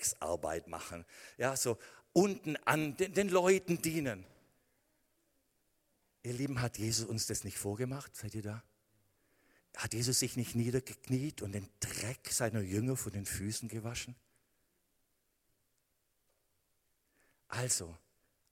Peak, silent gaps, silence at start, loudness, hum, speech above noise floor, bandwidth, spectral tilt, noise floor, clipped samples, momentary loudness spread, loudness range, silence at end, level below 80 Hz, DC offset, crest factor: -12 dBFS; none; 0 s; -36 LUFS; none; 43 dB; 16.5 kHz; -4 dB/octave; -79 dBFS; under 0.1%; 13 LU; 9 LU; 0.55 s; -64 dBFS; under 0.1%; 26 dB